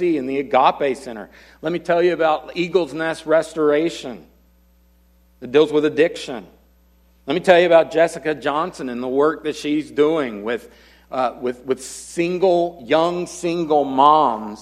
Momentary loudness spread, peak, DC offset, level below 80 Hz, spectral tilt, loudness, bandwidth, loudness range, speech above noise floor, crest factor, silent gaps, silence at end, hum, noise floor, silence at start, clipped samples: 15 LU; 0 dBFS; under 0.1%; -56 dBFS; -5 dB/octave; -19 LUFS; 14 kHz; 4 LU; 36 dB; 20 dB; none; 0 s; none; -55 dBFS; 0 s; under 0.1%